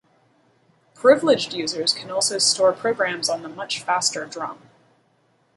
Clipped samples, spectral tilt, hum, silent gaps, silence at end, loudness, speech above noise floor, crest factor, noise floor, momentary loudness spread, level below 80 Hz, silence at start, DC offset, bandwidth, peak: under 0.1%; -1.5 dB/octave; none; none; 1.05 s; -21 LUFS; 42 dB; 22 dB; -63 dBFS; 12 LU; -70 dBFS; 1.05 s; under 0.1%; 11.5 kHz; -2 dBFS